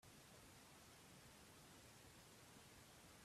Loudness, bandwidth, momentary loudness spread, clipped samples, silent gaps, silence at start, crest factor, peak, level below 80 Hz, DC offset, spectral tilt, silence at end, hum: -64 LUFS; 15.5 kHz; 0 LU; under 0.1%; none; 0 s; 14 dB; -52 dBFS; -80 dBFS; under 0.1%; -3 dB/octave; 0 s; none